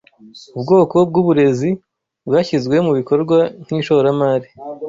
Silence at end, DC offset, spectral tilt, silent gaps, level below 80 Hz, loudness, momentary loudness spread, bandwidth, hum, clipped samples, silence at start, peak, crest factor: 0 s; under 0.1%; -7.5 dB/octave; none; -56 dBFS; -15 LUFS; 13 LU; 7.6 kHz; none; under 0.1%; 0.35 s; -2 dBFS; 14 dB